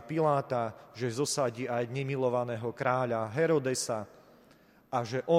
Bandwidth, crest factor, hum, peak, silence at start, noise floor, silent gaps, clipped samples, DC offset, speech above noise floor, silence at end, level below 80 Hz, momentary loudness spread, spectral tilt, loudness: 16 kHz; 18 dB; none; -12 dBFS; 0 s; -61 dBFS; none; under 0.1%; under 0.1%; 30 dB; 0 s; -72 dBFS; 8 LU; -5 dB/octave; -31 LUFS